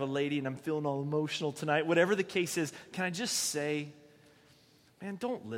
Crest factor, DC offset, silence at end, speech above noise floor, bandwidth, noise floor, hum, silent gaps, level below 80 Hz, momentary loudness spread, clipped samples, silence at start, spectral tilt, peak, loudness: 20 dB; under 0.1%; 0 s; 31 dB; 16 kHz; -63 dBFS; none; none; -78 dBFS; 10 LU; under 0.1%; 0 s; -4 dB/octave; -12 dBFS; -32 LUFS